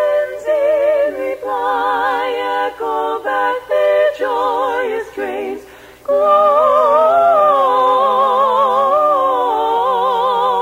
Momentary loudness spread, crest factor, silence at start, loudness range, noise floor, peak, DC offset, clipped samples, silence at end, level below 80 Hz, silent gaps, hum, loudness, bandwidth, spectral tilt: 9 LU; 12 dB; 0 s; 5 LU; -38 dBFS; -2 dBFS; under 0.1%; under 0.1%; 0 s; -56 dBFS; none; none; -14 LUFS; 16 kHz; -4 dB/octave